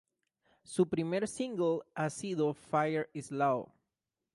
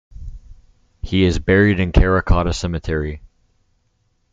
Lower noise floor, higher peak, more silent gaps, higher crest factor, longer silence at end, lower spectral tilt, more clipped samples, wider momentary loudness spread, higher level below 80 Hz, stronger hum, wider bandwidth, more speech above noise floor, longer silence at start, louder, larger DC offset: first, -89 dBFS vs -64 dBFS; second, -16 dBFS vs -2 dBFS; neither; about the same, 18 dB vs 16 dB; second, 0.7 s vs 1.05 s; about the same, -6 dB/octave vs -6.5 dB/octave; neither; second, 6 LU vs 23 LU; second, -72 dBFS vs -26 dBFS; neither; first, 11.5 kHz vs 7.8 kHz; first, 56 dB vs 48 dB; first, 0.7 s vs 0.15 s; second, -34 LUFS vs -18 LUFS; neither